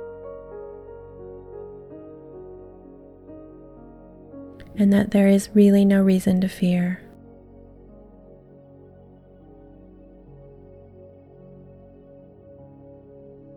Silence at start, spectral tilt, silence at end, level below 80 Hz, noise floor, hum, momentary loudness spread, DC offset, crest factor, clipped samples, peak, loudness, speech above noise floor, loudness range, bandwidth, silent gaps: 0 s; -7.5 dB/octave; 6.6 s; -52 dBFS; -48 dBFS; none; 28 LU; under 0.1%; 20 dB; under 0.1%; -6 dBFS; -19 LUFS; 31 dB; 23 LU; 13 kHz; none